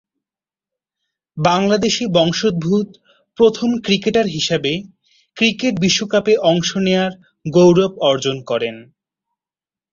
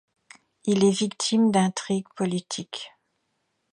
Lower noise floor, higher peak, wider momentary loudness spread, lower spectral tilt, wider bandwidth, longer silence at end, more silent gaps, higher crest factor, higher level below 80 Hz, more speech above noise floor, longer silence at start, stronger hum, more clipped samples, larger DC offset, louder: first, under -90 dBFS vs -75 dBFS; first, -2 dBFS vs -8 dBFS; second, 8 LU vs 14 LU; about the same, -5 dB/octave vs -5 dB/octave; second, 7.6 kHz vs 11 kHz; first, 1.1 s vs 0.85 s; neither; about the same, 16 dB vs 18 dB; first, -54 dBFS vs -70 dBFS; first, over 74 dB vs 51 dB; first, 1.35 s vs 0.65 s; neither; neither; neither; first, -16 LUFS vs -24 LUFS